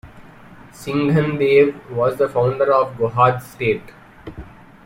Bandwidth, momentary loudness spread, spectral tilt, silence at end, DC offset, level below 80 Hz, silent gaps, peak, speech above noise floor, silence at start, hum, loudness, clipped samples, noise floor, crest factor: 16.5 kHz; 20 LU; -7.5 dB/octave; 0.35 s; under 0.1%; -48 dBFS; none; -2 dBFS; 24 dB; 0.05 s; none; -18 LUFS; under 0.1%; -42 dBFS; 18 dB